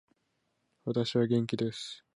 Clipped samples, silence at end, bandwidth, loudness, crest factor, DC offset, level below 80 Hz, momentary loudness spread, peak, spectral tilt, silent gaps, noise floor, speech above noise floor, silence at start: under 0.1%; 0.2 s; 11 kHz; -31 LUFS; 16 dB; under 0.1%; -72 dBFS; 12 LU; -16 dBFS; -6.5 dB/octave; none; -78 dBFS; 47 dB; 0.85 s